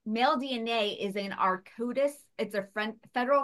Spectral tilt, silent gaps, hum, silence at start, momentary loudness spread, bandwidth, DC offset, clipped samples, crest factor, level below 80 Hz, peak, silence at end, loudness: -4.5 dB/octave; none; none; 0.05 s; 7 LU; 12.5 kHz; under 0.1%; under 0.1%; 18 dB; -80 dBFS; -12 dBFS; 0 s; -31 LUFS